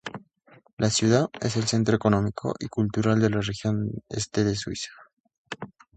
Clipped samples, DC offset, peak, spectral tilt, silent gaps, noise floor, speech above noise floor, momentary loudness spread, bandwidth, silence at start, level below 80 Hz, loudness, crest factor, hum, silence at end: under 0.1%; under 0.1%; -6 dBFS; -5.5 dB/octave; 0.73-0.77 s, 5.13-5.24 s, 5.38-5.45 s; -57 dBFS; 33 dB; 17 LU; 9.2 kHz; 0.05 s; -52 dBFS; -25 LUFS; 20 dB; none; 0.3 s